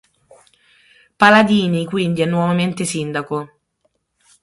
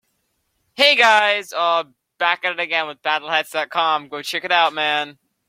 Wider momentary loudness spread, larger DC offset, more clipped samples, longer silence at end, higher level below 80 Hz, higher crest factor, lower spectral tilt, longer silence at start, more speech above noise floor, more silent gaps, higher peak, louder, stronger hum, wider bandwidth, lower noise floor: first, 14 LU vs 11 LU; neither; neither; first, 0.95 s vs 0.35 s; first, -58 dBFS vs -74 dBFS; about the same, 18 dB vs 18 dB; first, -5.5 dB/octave vs -1 dB/octave; first, 1.2 s vs 0.8 s; about the same, 51 dB vs 50 dB; neither; about the same, -2 dBFS vs -2 dBFS; about the same, -16 LUFS vs -18 LUFS; neither; second, 11.5 kHz vs 16.5 kHz; about the same, -67 dBFS vs -70 dBFS